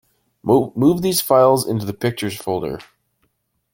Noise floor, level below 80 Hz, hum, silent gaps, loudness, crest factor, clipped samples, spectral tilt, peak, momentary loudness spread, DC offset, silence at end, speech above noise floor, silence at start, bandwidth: -68 dBFS; -52 dBFS; none; none; -18 LUFS; 18 dB; under 0.1%; -5.5 dB/octave; 0 dBFS; 13 LU; under 0.1%; 0.9 s; 51 dB; 0.45 s; 17 kHz